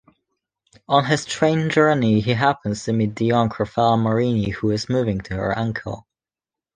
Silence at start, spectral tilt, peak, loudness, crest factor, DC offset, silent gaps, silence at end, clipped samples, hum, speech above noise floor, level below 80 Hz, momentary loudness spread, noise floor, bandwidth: 0.9 s; -6 dB/octave; -2 dBFS; -20 LUFS; 20 dB; under 0.1%; none; 0.75 s; under 0.1%; none; 70 dB; -48 dBFS; 8 LU; -90 dBFS; 9.8 kHz